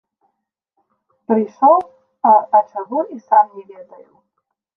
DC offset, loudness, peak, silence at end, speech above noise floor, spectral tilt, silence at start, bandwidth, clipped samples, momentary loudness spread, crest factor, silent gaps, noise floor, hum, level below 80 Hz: under 0.1%; -16 LUFS; -2 dBFS; 0.95 s; 59 dB; -9 dB/octave; 1.3 s; 2.8 kHz; under 0.1%; 10 LU; 16 dB; none; -75 dBFS; none; -74 dBFS